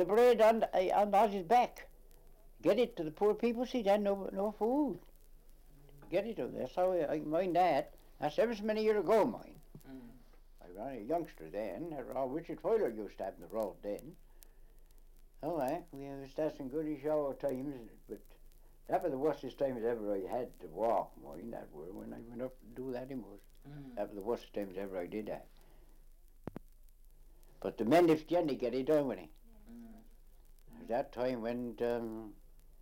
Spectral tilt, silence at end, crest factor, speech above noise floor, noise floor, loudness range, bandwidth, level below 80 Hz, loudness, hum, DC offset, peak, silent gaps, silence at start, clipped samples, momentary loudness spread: -6.5 dB/octave; 0 s; 18 dB; 23 dB; -58 dBFS; 10 LU; 16.5 kHz; -58 dBFS; -35 LUFS; none; under 0.1%; -16 dBFS; none; 0 s; under 0.1%; 20 LU